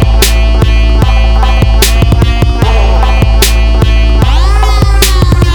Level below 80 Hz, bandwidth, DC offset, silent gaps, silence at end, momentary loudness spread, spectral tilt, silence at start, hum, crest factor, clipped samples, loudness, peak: -6 dBFS; over 20 kHz; 0.9%; none; 0 s; 2 LU; -5 dB/octave; 0 s; none; 6 dB; 0.8%; -8 LUFS; 0 dBFS